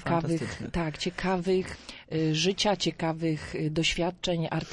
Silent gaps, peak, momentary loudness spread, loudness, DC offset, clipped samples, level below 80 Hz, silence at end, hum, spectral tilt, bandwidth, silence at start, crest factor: none; -12 dBFS; 6 LU; -29 LUFS; under 0.1%; under 0.1%; -48 dBFS; 0 s; none; -5 dB/octave; 11 kHz; 0 s; 16 dB